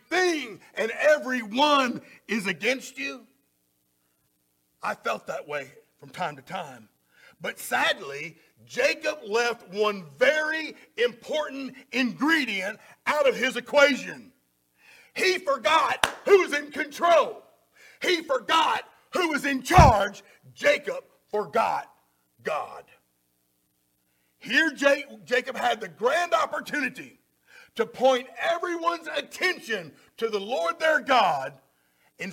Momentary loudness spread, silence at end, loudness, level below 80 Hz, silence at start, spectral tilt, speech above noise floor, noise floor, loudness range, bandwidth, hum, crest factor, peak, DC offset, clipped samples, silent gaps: 15 LU; 0 s; -25 LUFS; -46 dBFS; 0.1 s; -4 dB/octave; 46 dB; -71 dBFS; 9 LU; 17 kHz; 60 Hz at -65 dBFS; 24 dB; -2 dBFS; under 0.1%; under 0.1%; none